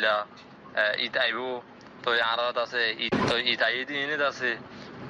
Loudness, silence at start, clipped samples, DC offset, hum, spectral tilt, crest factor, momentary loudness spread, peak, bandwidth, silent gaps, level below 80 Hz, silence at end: -26 LUFS; 0 s; under 0.1%; under 0.1%; none; -4 dB/octave; 18 dB; 10 LU; -10 dBFS; 10.5 kHz; none; -62 dBFS; 0 s